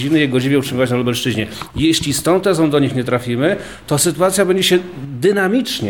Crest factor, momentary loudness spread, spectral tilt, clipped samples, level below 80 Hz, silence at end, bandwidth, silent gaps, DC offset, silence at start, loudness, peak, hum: 14 dB; 6 LU; -4.5 dB/octave; under 0.1%; -44 dBFS; 0 s; 19 kHz; none; 0.3%; 0 s; -16 LUFS; -2 dBFS; none